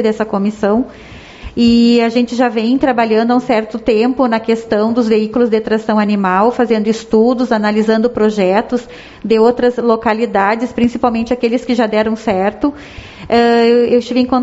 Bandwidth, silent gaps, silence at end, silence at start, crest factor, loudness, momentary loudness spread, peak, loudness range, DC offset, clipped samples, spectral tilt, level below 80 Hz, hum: 8 kHz; none; 0 s; 0 s; 12 dB; -13 LUFS; 6 LU; 0 dBFS; 1 LU; under 0.1%; under 0.1%; -4.5 dB/octave; -44 dBFS; none